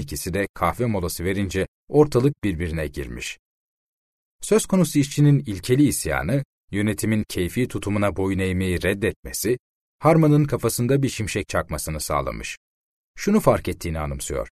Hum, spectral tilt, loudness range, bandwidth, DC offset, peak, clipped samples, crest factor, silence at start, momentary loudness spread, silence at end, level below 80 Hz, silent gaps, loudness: none; -6 dB/octave; 3 LU; 13.5 kHz; under 0.1%; -4 dBFS; under 0.1%; 18 dB; 0 s; 10 LU; 0.05 s; -40 dBFS; 0.49-0.54 s, 1.68-1.87 s, 3.39-4.39 s, 6.45-6.68 s, 9.16-9.23 s, 9.59-9.99 s, 12.57-13.14 s; -22 LUFS